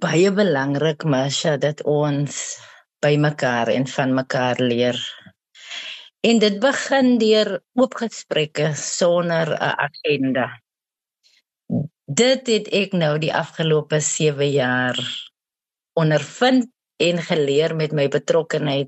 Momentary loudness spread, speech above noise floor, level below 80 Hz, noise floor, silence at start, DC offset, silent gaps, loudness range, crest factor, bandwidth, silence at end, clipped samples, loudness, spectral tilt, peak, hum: 10 LU; over 71 dB; -70 dBFS; under -90 dBFS; 0 s; under 0.1%; none; 3 LU; 16 dB; 8.6 kHz; 0 s; under 0.1%; -20 LUFS; -4.5 dB/octave; -4 dBFS; none